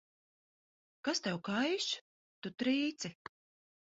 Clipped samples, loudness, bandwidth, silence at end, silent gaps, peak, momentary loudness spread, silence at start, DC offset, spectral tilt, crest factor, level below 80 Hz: under 0.1%; -36 LUFS; 7.6 kHz; 0.85 s; 2.01-2.42 s; -22 dBFS; 14 LU; 1.05 s; under 0.1%; -3 dB/octave; 18 dB; -80 dBFS